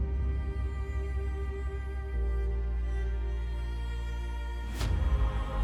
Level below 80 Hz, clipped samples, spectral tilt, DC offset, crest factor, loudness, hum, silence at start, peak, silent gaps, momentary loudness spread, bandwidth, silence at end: -32 dBFS; under 0.1%; -7 dB/octave; under 0.1%; 12 dB; -34 LUFS; none; 0 s; -18 dBFS; none; 6 LU; 9.8 kHz; 0 s